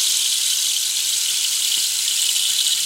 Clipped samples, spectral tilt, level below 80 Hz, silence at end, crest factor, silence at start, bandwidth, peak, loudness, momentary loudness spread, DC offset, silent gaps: under 0.1%; 5.5 dB/octave; -78 dBFS; 0 s; 16 dB; 0 s; 16 kHz; -4 dBFS; -17 LUFS; 1 LU; under 0.1%; none